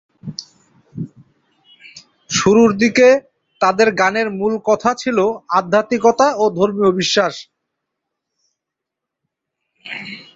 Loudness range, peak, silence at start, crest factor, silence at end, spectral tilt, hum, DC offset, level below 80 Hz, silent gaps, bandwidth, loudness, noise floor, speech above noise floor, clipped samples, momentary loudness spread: 6 LU; -2 dBFS; 0.25 s; 16 dB; 0.15 s; -4 dB/octave; none; under 0.1%; -56 dBFS; none; 7.8 kHz; -15 LUFS; -82 dBFS; 67 dB; under 0.1%; 19 LU